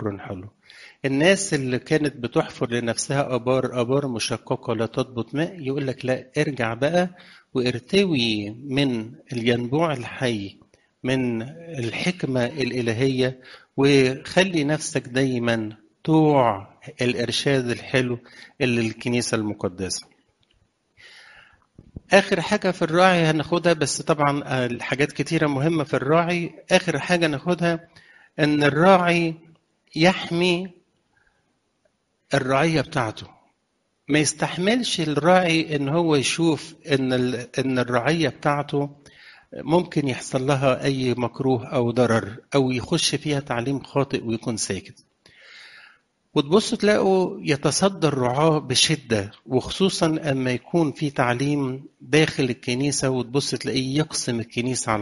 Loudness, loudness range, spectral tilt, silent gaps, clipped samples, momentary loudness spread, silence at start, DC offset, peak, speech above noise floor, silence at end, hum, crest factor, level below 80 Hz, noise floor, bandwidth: -22 LUFS; 5 LU; -5 dB/octave; none; under 0.1%; 9 LU; 0 s; under 0.1%; -2 dBFS; 50 dB; 0 s; none; 22 dB; -56 dBFS; -72 dBFS; 11.5 kHz